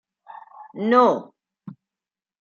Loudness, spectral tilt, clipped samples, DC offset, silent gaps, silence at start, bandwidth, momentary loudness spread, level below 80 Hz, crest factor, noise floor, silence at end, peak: -19 LUFS; -6.5 dB/octave; under 0.1%; under 0.1%; none; 0.6 s; 7 kHz; 25 LU; -78 dBFS; 22 dB; under -90 dBFS; 0.7 s; -2 dBFS